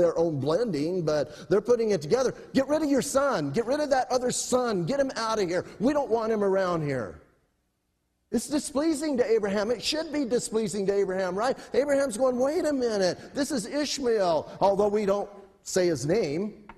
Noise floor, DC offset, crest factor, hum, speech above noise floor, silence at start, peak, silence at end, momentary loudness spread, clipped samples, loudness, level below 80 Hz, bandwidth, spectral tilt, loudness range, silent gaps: -75 dBFS; under 0.1%; 16 dB; none; 49 dB; 0 s; -10 dBFS; 0.05 s; 5 LU; under 0.1%; -26 LUFS; -58 dBFS; 13 kHz; -4.5 dB/octave; 3 LU; none